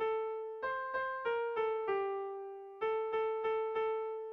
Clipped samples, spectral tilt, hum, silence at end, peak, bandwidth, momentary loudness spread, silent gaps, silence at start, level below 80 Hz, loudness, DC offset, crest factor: under 0.1%; -5.5 dB/octave; none; 0 s; -26 dBFS; 5.2 kHz; 6 LU; none; 0 s; -76 dBFS; -37 LUFS; under 0.1%; 12 dB